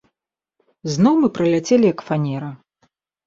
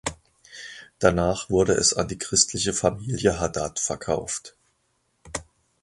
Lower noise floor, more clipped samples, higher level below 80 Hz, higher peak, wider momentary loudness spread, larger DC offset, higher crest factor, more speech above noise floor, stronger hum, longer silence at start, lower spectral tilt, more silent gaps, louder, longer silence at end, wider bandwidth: first, -83 dBFS vs -70 dBFS; neither; second, -60 dBFS vs -44 dBFS; about the same, -4 dBFS vs -2 dBFS; about the same, 14 LU vs 16 LU; neither; second, 16 dB vs 24 dB; first, 66 dB vs 47 dB; neither; first, 0.85 s vs 0.05 s; first, -6.5 dB/octave vs -3.5 dB/octave; neither; first, -18 LUFS vs -23 LUFS; first, 0.7 s vs 0.4 s; second, 7.8 kHz vs 11.5 kHz